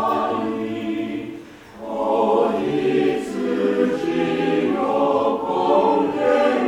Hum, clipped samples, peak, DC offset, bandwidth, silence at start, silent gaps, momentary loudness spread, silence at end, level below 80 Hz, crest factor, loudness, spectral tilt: none; under 0.1%; -6 dBFS; under 0.1%; 16.5 kHz; 0 s; none; 9 LU; 0 s; -56 dBFS; 14 dB; -20 LUFS; -6.5 dB/octave